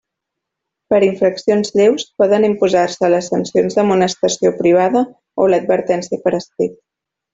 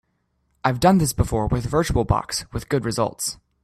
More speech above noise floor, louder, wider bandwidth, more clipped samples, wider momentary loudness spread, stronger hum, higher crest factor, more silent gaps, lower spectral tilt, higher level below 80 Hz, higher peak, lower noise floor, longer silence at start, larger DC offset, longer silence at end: first, 65 dB vs 49 dB; first, -15 LUFS vs -22 LUFS; second, 8 kHz vs 15.5 kHz; neither; second, 6 LU vs 10 LU; neither; second, 14 dB vs 20 dB; neither; about the same, -5 dB/octave vs -5.5 dB/octave; second, -58 dBFS vs -36 dBFS; about the same, -2 dBFS vs -2 dBFS; first, -80 dBFS vs -69 dBFS; first, 0.9 s vs 0.65 s; neither; first, 0.6 s vs 0.3 s